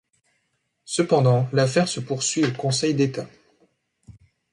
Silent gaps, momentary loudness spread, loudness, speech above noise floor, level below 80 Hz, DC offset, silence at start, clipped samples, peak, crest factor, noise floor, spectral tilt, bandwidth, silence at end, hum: none; 8 LU; -22 LUFS; 52 dB; -62 dBFS; under 0.1%; 0.9 s; under 0.1%; -6 dBFS; 18 dB; -73 dBFS; -5 dB/octave; 11.5 kHz; 0.4 s; none